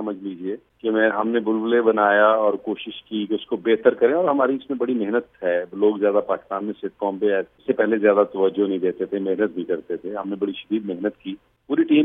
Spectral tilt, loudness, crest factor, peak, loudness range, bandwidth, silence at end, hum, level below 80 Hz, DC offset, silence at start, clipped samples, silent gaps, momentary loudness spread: -9 dB/octave; -22 LUFS; 20 dB; 0 dBFS; 4 LU; 3.8 kHz; 0 s; none; -68 dBFS; under 0.1%; 0 s; under 0.1%; none; 12 LU